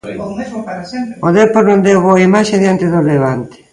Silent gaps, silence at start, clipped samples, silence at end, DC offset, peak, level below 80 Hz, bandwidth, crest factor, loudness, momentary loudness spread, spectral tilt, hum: none; 0.05 s; under 0.1%; 0.2 s; under 0.1%; 0 dBFS; -48 dBFS; 11 kHz; 12 dB; -11 LUFS; 14 LU; -6.5 dB/octave; none